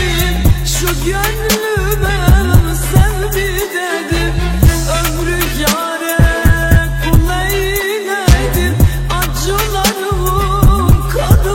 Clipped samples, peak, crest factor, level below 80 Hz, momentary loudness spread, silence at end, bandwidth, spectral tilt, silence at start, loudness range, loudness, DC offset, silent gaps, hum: 0.5%; 0 dBFS; 12 dB; -16 dBFS; 5 LU; 0 s; 17 kHz; -5 dB/octave; 0 s; 1 LU; -13 LUFS; under 0.1%; none; none